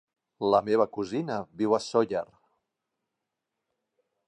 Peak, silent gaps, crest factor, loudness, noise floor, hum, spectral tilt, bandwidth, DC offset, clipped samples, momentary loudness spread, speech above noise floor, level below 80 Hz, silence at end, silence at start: -8 dBFS; none; 22 dB; -27 LUFS; -85 dBFS; none; -6 dB/octave; 10.5 kHz; under 0.1%; under 0.1%; 10 LU; 58 dB; -68 dBFS; 2.05 s; 0.4 s